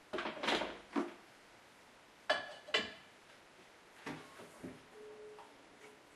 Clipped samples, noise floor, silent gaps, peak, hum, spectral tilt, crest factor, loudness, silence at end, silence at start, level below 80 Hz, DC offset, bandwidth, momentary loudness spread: under 0.1%; -62 dBFS; none; -18 dBFS; none; -3 dB/octave; 26 dB; -40 LUFS; 0 s; 0 s; -76 dBFS; under 0.1%; 13.5 kHz; 23 LU